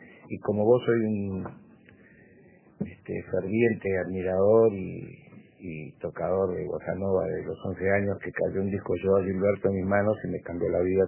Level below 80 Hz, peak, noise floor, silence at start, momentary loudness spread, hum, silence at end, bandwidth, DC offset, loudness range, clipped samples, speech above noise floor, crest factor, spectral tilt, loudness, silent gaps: -52 dBFS; -10 dBFS; -56 dBFS; 0 s; 15 LU; none; 0 s; 3.2 kHz; under 0.1%; 4 LU; under 0.1%; 29 dB; 18 dB; -11.5 dB/octave; -27 LUFS; none